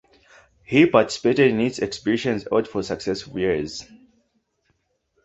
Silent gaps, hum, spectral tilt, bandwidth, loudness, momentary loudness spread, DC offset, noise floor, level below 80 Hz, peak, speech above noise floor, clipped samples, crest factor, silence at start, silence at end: none; none; -5.5 dB/octave; 8.2 kHz; -21 LUFS; 11 LU; under 0.1%; -70 dBFS; -54 dBFS; -2 dBFS; 49 dB; under 0.1%; 22 dB; 0.7 s; 1.4 s